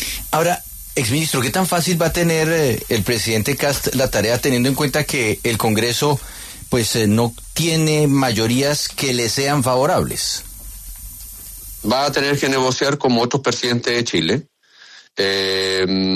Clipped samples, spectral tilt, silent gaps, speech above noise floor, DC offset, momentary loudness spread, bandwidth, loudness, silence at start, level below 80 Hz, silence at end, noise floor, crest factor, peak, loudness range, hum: under 0.1%; -4 dB/octave; none; 28 dB; under 0.1%; 9 LU; 14 kHz; -18 LUFS; 0 s; -40 dBFS; 0 s; -45 dBFS; 14 dB; -4 dBFS; 3 LU; none